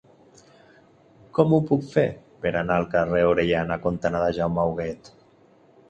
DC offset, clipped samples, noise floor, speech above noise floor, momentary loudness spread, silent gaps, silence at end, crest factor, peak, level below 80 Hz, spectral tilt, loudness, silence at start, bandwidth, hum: under 0.1%; under 0.1%; -56 dBFS; 34 dB; 9 LU; none; 0.95 s; 20 dB; -4 dBFS; -48 dBFS; -8 dB/octave; -23 LUFS; 1.35 s; 8.4 kHz; none